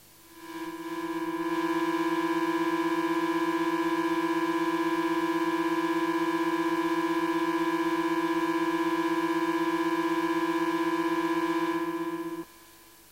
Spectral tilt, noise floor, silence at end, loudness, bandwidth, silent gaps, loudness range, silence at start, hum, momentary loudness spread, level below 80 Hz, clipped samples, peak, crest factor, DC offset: -4.5 dB/octave; -54 dBFS; 0.45 s; -28 LUFS; 16 kHz; none; 1 LU; 0.3 s; 50 Hz at -65 dBFS; 6 LU; -70 dBFS; under 0.1%; -18 dBFS; 10 dB; under 0.1%